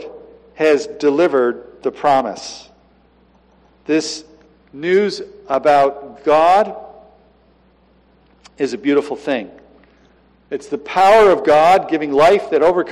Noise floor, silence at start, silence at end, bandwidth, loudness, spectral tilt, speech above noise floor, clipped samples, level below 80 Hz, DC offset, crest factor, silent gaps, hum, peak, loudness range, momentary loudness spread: -53 dBFS; 0 s; 0 s; 13 kHz; -15 LUFS; -4.5 dB/octave; 38 dB; under 0.1%; -52 dBFS; under 0.1%; 14 dB; none; none; -4 dBFS; 9 LU; 18 LU